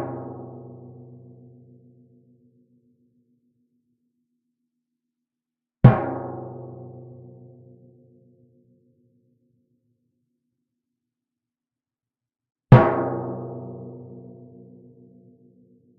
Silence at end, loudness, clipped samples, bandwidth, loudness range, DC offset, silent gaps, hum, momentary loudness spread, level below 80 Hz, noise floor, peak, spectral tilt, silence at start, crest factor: 1.8 s; -20 LUFS; under 0.1%; 4.3 kHz; 17 LU; under 0.1%; none; none; 30 LU; -50 dBFS; under -90 dBFS; 0 dBFS; -9 dB/octave; 0 s; 28 dB